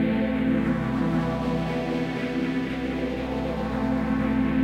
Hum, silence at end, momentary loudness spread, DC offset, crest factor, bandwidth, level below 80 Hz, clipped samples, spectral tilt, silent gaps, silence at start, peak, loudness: none; 0 s; 5 LU; under 0.1%; 12 dB; 10 kHz; -40 dBFS; under 0.1%; -8 dB/octave; none; 0 s; -12 dBFS; -26 LUFS